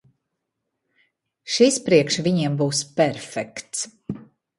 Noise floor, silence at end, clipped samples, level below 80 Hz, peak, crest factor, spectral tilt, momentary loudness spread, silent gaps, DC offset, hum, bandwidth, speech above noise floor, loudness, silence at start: -79 dBFS; 0.35 s; under 0.1%; -62 dBFS; -2 dBFS; 20 dB; -4.5 dB/octave; 18 LU; none; under 0.1%; none; 11.5 kHz; 58 dB; -21 LUFS; 1.45 s